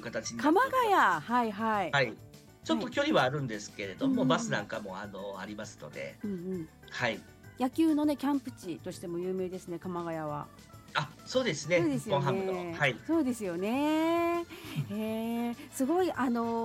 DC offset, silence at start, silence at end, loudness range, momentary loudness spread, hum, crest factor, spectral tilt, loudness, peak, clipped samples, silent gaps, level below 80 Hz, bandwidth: under 0.1%; 0 s; 0 s; 6 LU; 14 LU; none; 18 dB; -5 dB/octave; -31 LUFS; -12 dBFS; under 0.1%; none; -64 dBFS; 16.5 kHz